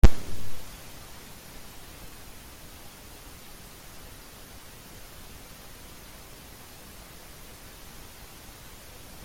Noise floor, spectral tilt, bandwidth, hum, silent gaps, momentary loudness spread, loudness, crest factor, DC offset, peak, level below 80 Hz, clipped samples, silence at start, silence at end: -46 dBFS; -5 dB/octave; 16.5 kHz; none; none; 3 LU; -41 LUFS; 24 dB; under 0.1%; -2 dBFS; -34 dBFS; under 0.1%; 0.05 s; 7.15 s